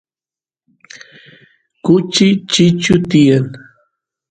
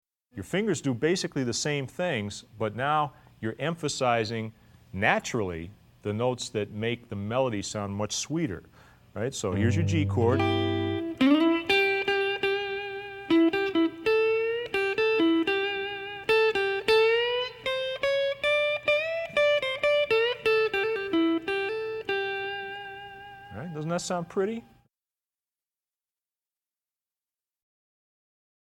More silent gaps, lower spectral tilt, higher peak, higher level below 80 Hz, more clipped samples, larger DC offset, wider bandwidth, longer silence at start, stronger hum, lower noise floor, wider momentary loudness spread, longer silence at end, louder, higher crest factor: neither; about the same, -5.5 dB/octave vs -5 dB/octave; first, 0 dBFS vs -8 dBFS; first, -48 dBFS vs -62 dBFS; neither; neither; second, 9.4 kHz vs 15.5 kHz; first, 1.85 s vs 0.35 s; neither; about the same, under -90 dBFS vs under -90 dBFS; second, 6 LU vs 13 LU; second, 0.75 s vs 4.05 s; first, -12 LUFS vs -27 LUFS; about the same, 16 dB vs 20 dB